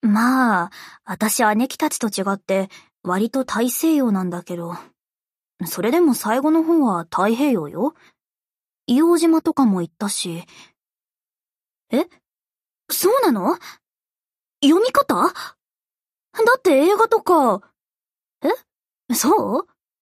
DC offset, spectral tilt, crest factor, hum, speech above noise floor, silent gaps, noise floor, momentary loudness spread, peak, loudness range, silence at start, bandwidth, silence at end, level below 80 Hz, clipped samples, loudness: under 0.1%; -4.5 dB/octave; 16 dB; none; over 72 dB; none; under -90 dBFS; 14 LU; -4 dBFS; 5 LU; 0.05 s; 15.5 kHz; 0.4 s; -68 dBFS; under 0.1%; -19 LUFS